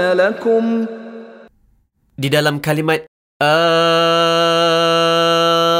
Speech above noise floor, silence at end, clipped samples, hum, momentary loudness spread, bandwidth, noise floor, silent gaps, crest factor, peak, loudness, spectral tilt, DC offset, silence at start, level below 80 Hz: 43 dB; 0 s; under 0.1%; none; 9 LU; 16 kHz; -58 dBFS; 3.08-3.40 s; 12 dB; -2 dBFS; -14 LUFS; -4.5 dB/octave; under 0.1%; 0 s; -58 dBFS